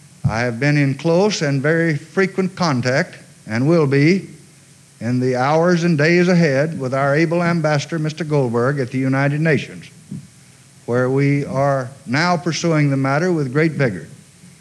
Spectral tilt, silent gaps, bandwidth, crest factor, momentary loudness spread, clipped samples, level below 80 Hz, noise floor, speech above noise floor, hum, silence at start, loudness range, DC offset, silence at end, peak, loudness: -6.5 dB/octave; none; 11.5 kHz; 14 dB; 8 LU; under 0.1%; -54 dBFS; -47 dBFS; 30 dB; none; 0.25 s; 4 LU; under 0.1%; 0.15 s; -4 dBFS; -18 LUFS